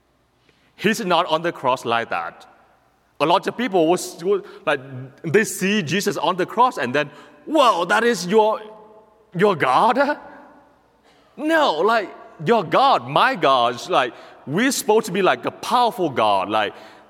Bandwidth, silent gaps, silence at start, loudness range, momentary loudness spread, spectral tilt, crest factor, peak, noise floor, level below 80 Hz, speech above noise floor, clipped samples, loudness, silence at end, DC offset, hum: 17 kHz; none; 0.8 s; 4 LU; 10 LU; -4 dB/octave; 20 dB; 0 dBFS; -60 dBFS; -70 dBFS; 41 dB; under 0.1%; -19 LUFS; 0.2 s; under 0.1%; none